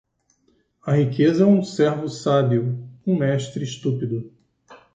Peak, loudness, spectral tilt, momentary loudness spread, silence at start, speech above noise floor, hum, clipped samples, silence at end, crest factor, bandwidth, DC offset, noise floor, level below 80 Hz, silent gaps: -4 dBFS; -21 LUFS; -7.5 dB/octave; 11 LU; 0.85 s; 45 dB; none; under 0.1%; 0.2 s; 16 dB; 9 kHz; under 0.1%; -64 dBFS; -64 dBFS; none